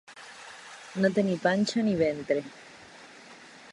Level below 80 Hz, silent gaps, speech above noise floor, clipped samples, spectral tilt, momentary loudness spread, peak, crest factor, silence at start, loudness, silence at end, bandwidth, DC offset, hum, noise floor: -66 dBFS; none; 23 dB; under 0.1%; -5.5 dB/octave; 22 LU; -10 dBFS; 20 dB; 0.1 s; -27 LUFS; 0 s; 11.5 kHz; under 0.1%; none; -50 dBFS